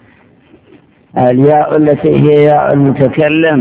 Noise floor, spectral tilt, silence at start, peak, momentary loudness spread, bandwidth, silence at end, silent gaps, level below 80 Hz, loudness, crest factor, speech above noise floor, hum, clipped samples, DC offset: -44 dBFS; -11.5 dB/octave; 1.15 s; 0 dBFS; 4 LU; 4 kHz; 0 s; none; -44 dBFS; -9 LUFS; 10 dB; 36 dB; none; 0.8%; under 0.1%